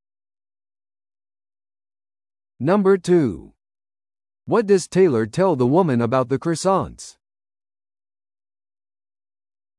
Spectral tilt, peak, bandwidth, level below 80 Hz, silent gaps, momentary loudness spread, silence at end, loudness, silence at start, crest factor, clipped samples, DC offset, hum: -6.5 dB/octave; -4 dBFS; 11.5 kHz; -56 dBFS; none; 10 LU; 2.7 s; -19 LUFS; 2.6 s; 18 dB; under 0.1%; under 0.1%; none